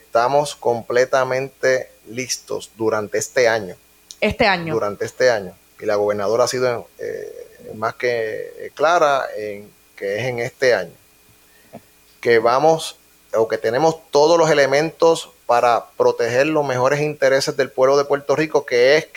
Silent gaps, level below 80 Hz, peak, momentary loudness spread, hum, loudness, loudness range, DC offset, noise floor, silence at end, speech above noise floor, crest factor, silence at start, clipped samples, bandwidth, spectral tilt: none; -54 dBFS; -4 dBFS; 14 LU; none; -18 LUFS; 5 LU; under 0.1%; -52 dBFS; 0.1 s; 34 dB; 16 dB; 0.15 s; under 0.1%; 18.5 kHz; -4 dB/octave